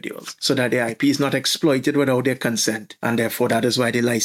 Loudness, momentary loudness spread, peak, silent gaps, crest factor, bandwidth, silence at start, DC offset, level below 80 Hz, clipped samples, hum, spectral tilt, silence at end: -20 LUFS; 4 LU; -4 dBFS; none; 16 dB; 17 kHz; 0.05 s; under 0.1%; -66 dBFS; under 0.1%; none; -4 dB/octave; 0 s